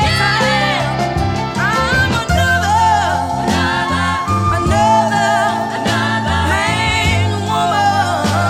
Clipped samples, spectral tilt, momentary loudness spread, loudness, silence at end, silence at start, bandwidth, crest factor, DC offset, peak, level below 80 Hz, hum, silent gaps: under 0.1%; -4.5 dB/octave; 4 LU; -14 LUFS; 0 s; 0 s; 16 kHz; 12 dB; under 0.1%; -2 dBFS; -30 dBFS; none; none